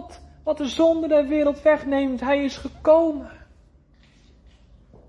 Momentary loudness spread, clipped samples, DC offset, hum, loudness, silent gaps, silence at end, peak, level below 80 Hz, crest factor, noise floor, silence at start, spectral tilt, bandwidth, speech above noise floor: 11 LU; under 0.1%; under 0.1%; none; -21 LUFS; none; 1.75 s; -6 dBFS; -48 dBFS; 16 dB; -55 dBFS; 0 s; -5.5 dB/octave; 11 kHz; 34 dB